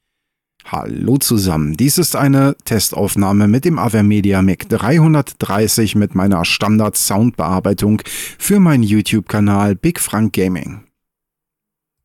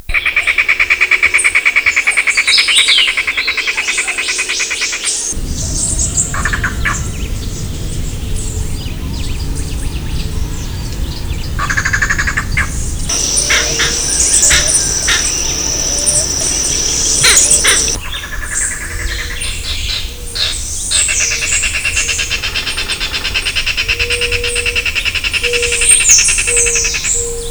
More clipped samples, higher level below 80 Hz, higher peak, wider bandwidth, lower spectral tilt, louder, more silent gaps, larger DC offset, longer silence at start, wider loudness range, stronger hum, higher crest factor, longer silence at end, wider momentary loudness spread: neither; second, -44 dBFS vs -24 dBFS; second, -4 dBFS vs 0 dBFS; second, 18 kHz vs over 20 kHz; first, -5.5 dB/octave vs -0.5 dB/octave; about the same, -14 LUFS vs -12 LUFS; neither; neither; first, 0.65 s vs 0.1 s; second, 2 LU vs 10 LU; neither; about the same, 10 dB vs 14 dB; first, 1.25 s vs 0 s; second, 6 LU vs 14 LU